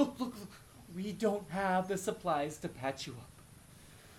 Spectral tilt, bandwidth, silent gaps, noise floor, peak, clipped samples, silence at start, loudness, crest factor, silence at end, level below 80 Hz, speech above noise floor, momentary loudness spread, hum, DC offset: -5 dB/octave; 17.5 kHz; none; -57 dBFS; -18 dBFS; under 0.1%; 0 s; -36 LUFS; 20 dB; 0 s; -64 dBFS; 21 dB; 23 LU; none; under 0.1%